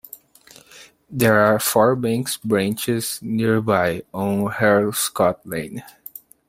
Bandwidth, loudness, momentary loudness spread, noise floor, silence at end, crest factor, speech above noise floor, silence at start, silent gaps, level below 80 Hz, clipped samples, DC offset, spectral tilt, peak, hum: 16.5 kHz; -20 LUFS; 17 LU; -49 dBFS; 0.6 s; 20 dB; 30 dB; 0.75 s; none; -56 dBFS; under 0.1%; under 0.1%; -4.5 dB/octave; 0 dBFS; none